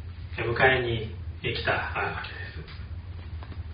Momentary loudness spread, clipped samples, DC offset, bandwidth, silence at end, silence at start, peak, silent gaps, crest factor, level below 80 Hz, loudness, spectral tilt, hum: 18 LU; under 0.1%; under 0.1%; 5.2 kHz; 0 s; 0 s; -8 dBFS; none; 22 dB; -42 dBFS; -27 LUFS; -3.5 dB/octave; none